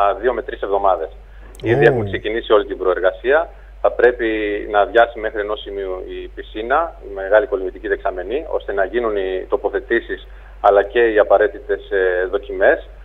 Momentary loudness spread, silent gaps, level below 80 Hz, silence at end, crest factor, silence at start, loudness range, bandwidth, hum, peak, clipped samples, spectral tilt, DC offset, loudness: 12 LU; none; -38 dBFS; 0 s; 18 dB; 0 s; 4 LU; 5.4 kHz; none; 0 dBFS; under 0.1%; -7.5 dB/octave; under 0.1%; -18 LUFS